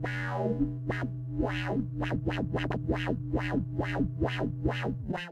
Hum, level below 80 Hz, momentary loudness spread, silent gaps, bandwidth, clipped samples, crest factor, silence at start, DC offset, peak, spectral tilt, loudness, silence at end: none; -44 dBFS; 3 LU; none; 8.6 kHz; under 0.1%; 16 dB; 0 s; under 0.1%; -16 dBFS; -8 dB/octave; -32 LUFS; 0 s